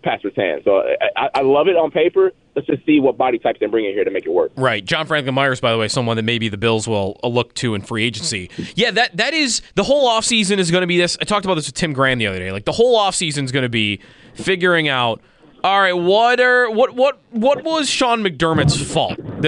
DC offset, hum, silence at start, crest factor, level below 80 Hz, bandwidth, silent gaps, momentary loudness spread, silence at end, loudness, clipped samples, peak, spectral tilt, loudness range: under 0.1%; none; 0.05 s; 14 dB; -48 dBFS; 10.5 kHz; none; 7 LU; 0 s; -17 LUFS; under 0.1%; -4 dBFS; -4 dB/octave; 3 LU